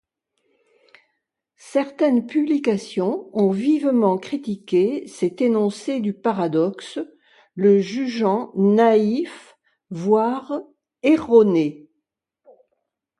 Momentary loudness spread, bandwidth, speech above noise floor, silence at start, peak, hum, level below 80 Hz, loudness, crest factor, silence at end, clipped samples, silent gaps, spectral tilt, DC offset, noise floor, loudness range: 12 LU; 11.5 kHz; 59 dB; 1.65 s; -2 dBFS; none; -66 dBFS; -20 LUFS; 18 dB; 1.45 s; under 0.1%; none; -7 dB/octave; under 0.1%; -78 dBFS; 3 LU